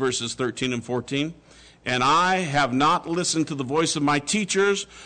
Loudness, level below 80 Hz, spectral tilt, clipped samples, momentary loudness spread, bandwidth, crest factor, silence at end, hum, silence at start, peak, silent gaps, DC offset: -23 LUFS; -56 dBFS; -3.5 dB/octave; under 0.1%; 8 LU; 9.4 kHz; 12 dB; 0 s; none; 0 s; -12 dBFS; none; under 0.1%